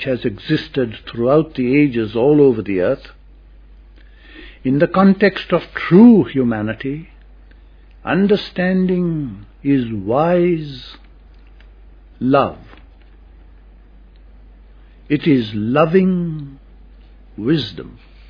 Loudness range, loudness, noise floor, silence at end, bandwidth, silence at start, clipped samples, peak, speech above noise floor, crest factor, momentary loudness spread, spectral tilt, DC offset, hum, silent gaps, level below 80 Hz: 10 LU; -16 LUFS; -43 dBFS; 0.35 s; 5.2 kHz; 0 s; under 0.1%; 0 dBFS; 28 dB; 18 dB; 14 LU; -9.5 dB/octave; under 0.1%; none; none; -42 dBFS